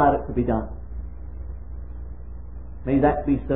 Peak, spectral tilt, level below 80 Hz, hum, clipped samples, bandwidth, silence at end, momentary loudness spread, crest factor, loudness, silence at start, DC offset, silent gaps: -4 dBFS; -12.5 dB/octave; -34 dBFS; 60 Hz at -35 dBFS; under 0.1%; 3.8 kHz; 0 s; 19 LU; 20 dB; -23 LUFS; 0 s; 1%; none